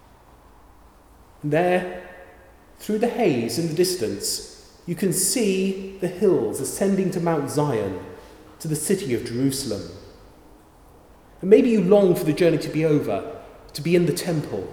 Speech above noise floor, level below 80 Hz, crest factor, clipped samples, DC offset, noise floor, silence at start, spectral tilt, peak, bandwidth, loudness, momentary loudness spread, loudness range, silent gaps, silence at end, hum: 29 dB; -54 dBFS; 22 dB; under 0.1%; under 0.1%; -51 dBFS; 1.45 s; -5 dB/octave; -2 dBFS; 19 kHz; -22 LUFS; 18 LU; 7 LU; none; 0 s; none